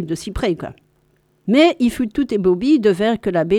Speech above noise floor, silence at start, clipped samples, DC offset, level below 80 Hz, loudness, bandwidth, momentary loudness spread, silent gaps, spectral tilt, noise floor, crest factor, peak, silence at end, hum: 43 dB; 0 s; under 0.1%; under 0.1%; -40 dBFS; -17 LUFS; 14.5 kHz; 12 LU; none; -6 dB/octave; -60 dBFS; 16 dB; -2 dBFS; 0 s; none